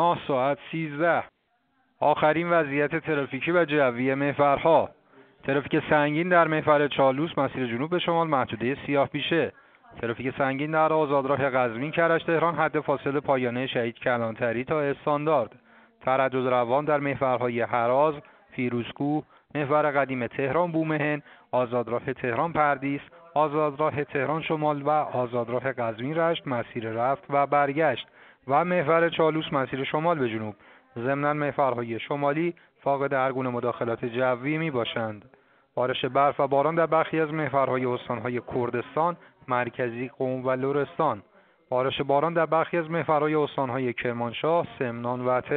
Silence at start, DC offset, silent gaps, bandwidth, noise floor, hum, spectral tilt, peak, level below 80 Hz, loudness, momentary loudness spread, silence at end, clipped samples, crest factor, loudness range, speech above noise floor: 0 s; under 0.1%; none; 4.5 kHz; -70 dBFS; none; -4.5 dB/octave; -6 dBFS; -64 dBFS; -26 LUFS; 8 LU; 0 s; under 0.1%; 20 dB; 4 LU; 45 dB